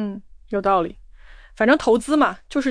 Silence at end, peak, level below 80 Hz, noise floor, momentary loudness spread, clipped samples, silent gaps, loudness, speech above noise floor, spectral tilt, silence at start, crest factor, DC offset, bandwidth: 0 s; -6 dBFS; -46 dBFS; -44 dBFS; 13 LU; under 0.1%; none; -20 LUFS; 25 dB; -5 dB/octave; 0 s; 16 dB; under 0.1%; 10.5 kHz